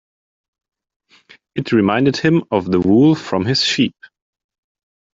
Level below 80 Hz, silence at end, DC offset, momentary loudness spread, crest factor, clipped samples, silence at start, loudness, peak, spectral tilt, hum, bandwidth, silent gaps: -54 dBFS; 1.25 s; under 0.1%; 7 LU; 16 dB; under 0.1%; 1.55 s; -16 LUFS; -2 dBFS; -6 dB/octave; none; 7.8 kHz; none